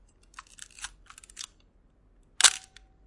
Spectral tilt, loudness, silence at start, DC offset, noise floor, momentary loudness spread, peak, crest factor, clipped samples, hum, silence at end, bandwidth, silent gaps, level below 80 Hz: 3.5 dB/octave; -21 LUFS; 0.8 s; under 0.1%; -62 dBFS; 26 LU; 0 dBFS; 32 dB; under 0.1%; none; 0.5 s; 12 kHz; none; -60 dBFS